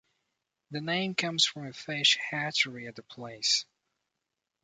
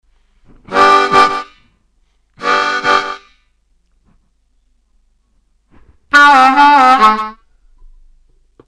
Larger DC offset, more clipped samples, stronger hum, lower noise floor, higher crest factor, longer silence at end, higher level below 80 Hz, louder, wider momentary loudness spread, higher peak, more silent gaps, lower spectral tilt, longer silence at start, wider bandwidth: neither; neither; neither; first, -86 dBFS vs -57 dBFS; first, 22 dB vs 14 dB; second, 1 s vs 1.35 s; second, -78 dBFS vs -48 dBFS; second, -28 LUFS vs -9 LUFS; about the same, 18 LU vs 16 LU; second, -10 dBFS vs 0 dBFS; neither; about the same, -2 dB/octave vs -2.5 dB/octave; about the same, 0.7 s vs 0.7 s; second, 9.6 kHz vs 12.5 kHz